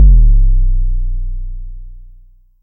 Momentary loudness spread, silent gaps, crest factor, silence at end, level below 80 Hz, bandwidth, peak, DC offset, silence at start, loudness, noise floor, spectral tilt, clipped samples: 22 LU; none; 10 dB; 0.65 s; -10 dBFS; 0.6 kHz; 0 dBFS; under 0.1%; 0 s; -16 LUFS; -42 dBFS; -14.5 dB/octave; under 0.1%